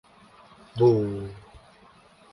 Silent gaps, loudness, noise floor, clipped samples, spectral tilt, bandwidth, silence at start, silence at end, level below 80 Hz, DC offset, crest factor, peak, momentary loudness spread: none; -24 LUFS; -55 dBFS; under 0.1%; -9.5 dB/octave; 10.5 kHz; 0.75 s; 0.75 s; -56 dBFS; under 0.1%; 20 dB; -8 dBFS; 20 LU